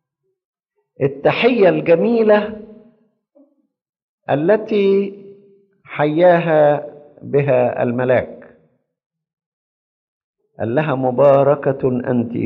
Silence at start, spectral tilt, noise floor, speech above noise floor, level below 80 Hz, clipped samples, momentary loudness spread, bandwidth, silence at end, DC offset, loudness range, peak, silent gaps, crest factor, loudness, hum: 1 s; -6 dB/octave; -58 dBFS; 43 dB; -58 dBFS; under 0.1%; 14 LU; 5.6 kHz; 0 s; under 0.1%; 5 LU; -2 dBFS; 3.89-3.93 s, 4.02-4.18 s, 9.06-9.10 s, 9.33-9.37 s, 9.46-10.34 s; 16 dB; -16 LUFS; none